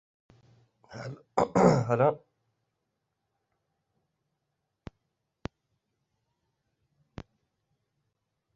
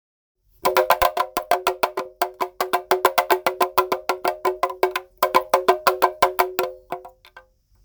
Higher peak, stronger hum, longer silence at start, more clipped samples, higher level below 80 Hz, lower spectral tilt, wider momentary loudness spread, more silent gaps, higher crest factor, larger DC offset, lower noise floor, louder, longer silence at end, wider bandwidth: second, -8 dBFS vs 0 dBFS; neither; first, 0.9 s vs 0.65 s; neither; second, -62 dBFS vs -52 dBFS; first, -7.5 dB/octave vs -2.5 dB/octave; first, 26 LU vs 8 LU; neither; about the same, 26 dB vs 22 dB; neither; first, -82 dBFS vs -51 dBFS; second, -26 LUFS vs -21 LUFS; first, 6.4 s vs 0.45 s; second, 8.2 kHz vs over 20 kHz